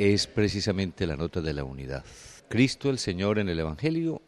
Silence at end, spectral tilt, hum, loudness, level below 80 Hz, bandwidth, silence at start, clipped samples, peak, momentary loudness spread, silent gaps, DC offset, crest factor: 0.1 s; -5.5 dB/octave; none; -28 LUFS; -46 dBFS; 12.5 kHz; 0 s; under 0.1%; -10 dBFS; 13 LU; none; under 0.1%; 18 dB